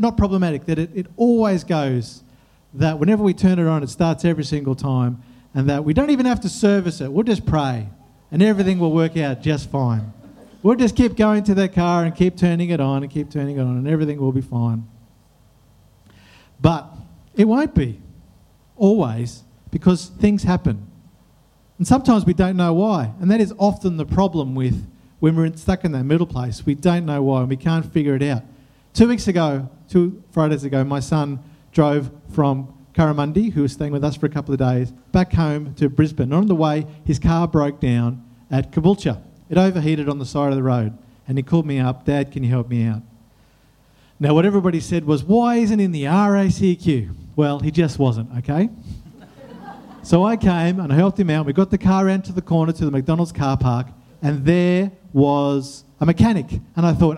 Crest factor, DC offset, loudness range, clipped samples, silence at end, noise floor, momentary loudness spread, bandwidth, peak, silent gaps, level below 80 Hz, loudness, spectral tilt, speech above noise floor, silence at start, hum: 18 dB; under 0.1%; 3 LU; under 0.1%; 0 s; -54 dBFS; 9 LU; 11 kHz; 0 dBFS; none; -40 dBFS; -19 LUFS; -7.5 dB/octave; 36 dB; 0 s; none